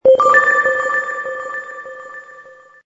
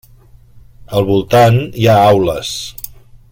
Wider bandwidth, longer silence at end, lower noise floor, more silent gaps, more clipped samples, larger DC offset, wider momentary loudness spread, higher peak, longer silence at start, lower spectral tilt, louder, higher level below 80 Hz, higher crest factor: second, 7.6 kHz vs 17 kHz; about the same, 0.45 s vs 0.4 s; about the same, -42 dBFS vs -42 dBFS; neither; neither; neither; first, 23 LU vs 16 LU; about the same, 0 dBFS vs 0 dBFS; second, 0.05 s vs 0.8 s; second, -3 dB/octave vs -6 dB/octave; about the same, -14 LUFS vs -12 LUFS; second, -58 dBFS vs -40 dBFS; about the same, 16 dB vs 14 dB